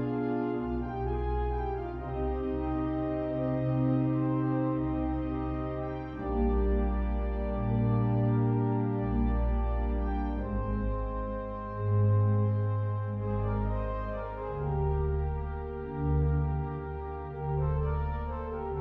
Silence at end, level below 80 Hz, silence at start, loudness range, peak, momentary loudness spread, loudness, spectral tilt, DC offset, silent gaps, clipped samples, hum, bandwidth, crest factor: 0 s; -36 dBFS; 0 s; 3 LU; -18 dBFS; 8 LU; -31 LUFS; -12 dB/octave; under 0.1%; none; under 0.1%; none; 4.4 kHz; 12 dB